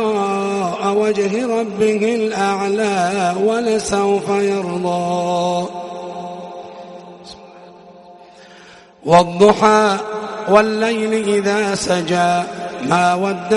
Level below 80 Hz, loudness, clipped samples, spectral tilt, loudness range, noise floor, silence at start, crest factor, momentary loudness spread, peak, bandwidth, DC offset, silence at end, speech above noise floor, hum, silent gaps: -54 dBFS; -16 LUFS; under 0.1%; -5 dB/octave; 10 LU; -43 dBFS; 0 s; 18 dB; 16 LU; 0 dBFS; 11.5 kHz; under 0.1%; 0 s; 27 dB; none; none